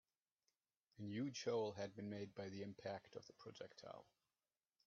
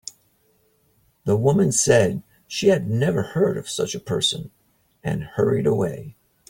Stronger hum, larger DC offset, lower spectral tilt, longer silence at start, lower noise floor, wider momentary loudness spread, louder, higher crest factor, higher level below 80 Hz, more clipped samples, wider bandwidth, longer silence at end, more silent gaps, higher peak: neither; neither; about the same, -5 dB/octave vs -4.5 dB/octave; second, 1 s vs 1.25 s; first, under -90 dBFS vs -63 dBFS; about the same, 15 LU vs 15 LU; second, -50 LUFS vs -21 LUFS; about the same, 20 dB vs 20 dB; second, -88 dBFS vs -54 dBFS; neither; second, 7.2 kHz vs 17 kHz; first, 0.85 s vs 0.4 s; neither; second, -32 dBFS vs -2 dBFS